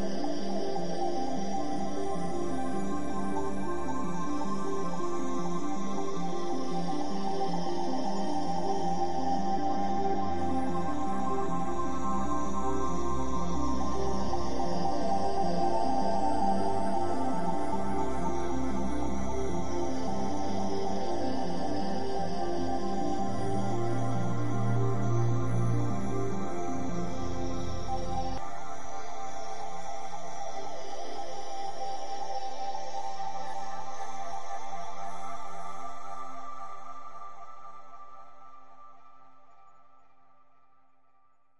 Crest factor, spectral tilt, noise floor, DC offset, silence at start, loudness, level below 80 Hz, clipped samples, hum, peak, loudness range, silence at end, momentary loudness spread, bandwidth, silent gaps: 14 dB; -6.5 dB/octave; -70 dBFS; 5%; 0 s; -34 LUFS; -50 dBFS; under 0.1%; none; -16 dBFS; 10 LU; 0 s; 11 LU; 11 kHz; none